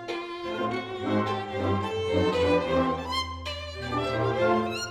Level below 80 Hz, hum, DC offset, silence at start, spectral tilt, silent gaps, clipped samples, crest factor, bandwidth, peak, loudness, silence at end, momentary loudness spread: -48 dBFS; none; under 0.1%; 0 s; -5.5 dB/octave; none; under 0.1%; 16 dB; 13.5 kHz; -12 dBFS; -28 LUFS; 0 s; 9 LU